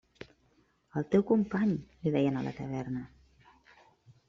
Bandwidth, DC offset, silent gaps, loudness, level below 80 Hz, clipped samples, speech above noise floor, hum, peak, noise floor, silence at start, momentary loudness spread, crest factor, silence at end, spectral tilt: 7.2 kHz; under 0.1%; none; -31 LUFS; -62 dBFS; under 0.1%; 39 dB; none; -12 dBFS; -69 dBFS; 0.2 s; 24 LU; 20 dB; 1.2 s; -8 dB/octave